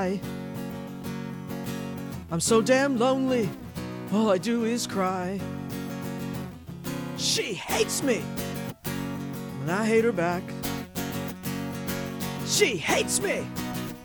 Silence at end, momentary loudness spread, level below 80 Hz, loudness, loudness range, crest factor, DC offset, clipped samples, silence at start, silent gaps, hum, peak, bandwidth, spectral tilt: 0 s; 12 LU; -54 dBFS; -28 LUFS; 4 LU; 20 dB; under 0.1%; under 0.1%; 0 s; none; none; -8 dBFS; over 20 kHz; -4 dB/octave